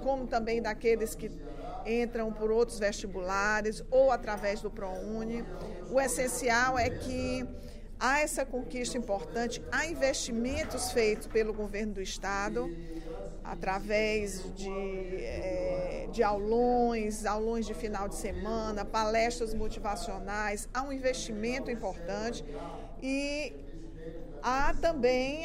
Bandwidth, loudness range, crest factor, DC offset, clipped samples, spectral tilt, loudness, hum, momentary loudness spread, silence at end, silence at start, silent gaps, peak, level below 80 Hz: 16 kHz; 4 LU; 18 dB; under 0.1%; under 0.1%; -4 dB/octave; -32 LUFS; none; 13 LU; 0 s; 0 s; none; -14 dBFS; -42 dBFS